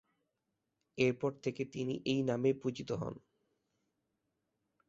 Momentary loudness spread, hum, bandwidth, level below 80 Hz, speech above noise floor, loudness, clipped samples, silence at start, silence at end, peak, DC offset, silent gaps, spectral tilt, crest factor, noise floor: 10 LU; none; 7.8 kHz; -72 dBFS; 51 dB; -36 LUFS; under 0.1%; 0.95 s; 1.7 s; -16 dBFS; under 0.1%; none; -6 dB/octave; 22 dB; -86 dBFS